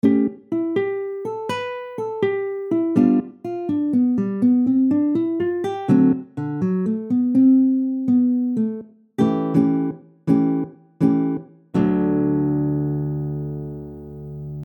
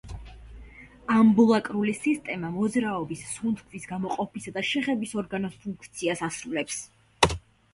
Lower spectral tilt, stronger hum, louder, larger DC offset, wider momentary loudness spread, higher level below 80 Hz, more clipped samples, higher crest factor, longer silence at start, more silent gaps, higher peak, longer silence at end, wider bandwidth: first, -9.5 dB/octave vs -4.5 dB/octave; neither; first, -21 LUFS vs -27 LUFS; neither; second, 13 LU vs 17 LU; about the same, -52 dBFS vs -50 dBFS; neither; second, 18 dB vs 24 dB; about the same, 0.05 s vs 0.05 s; neither; about the same, -2 dBFS vs -2 dBFS; second, 0 s vs 0.35 s; second, 6.8 kHz vs 11.5 kHz